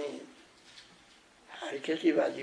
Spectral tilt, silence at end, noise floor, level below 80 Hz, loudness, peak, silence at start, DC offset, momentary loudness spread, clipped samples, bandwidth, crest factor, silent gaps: -4.5 dB/octave; 0 s; -60 dBFS; -80 dBFS; -32 LUFS; -14 dBFS; 0 s; under 0.1%; 25 LU; under 0.1%; 10.5 kHz; 20 dB; none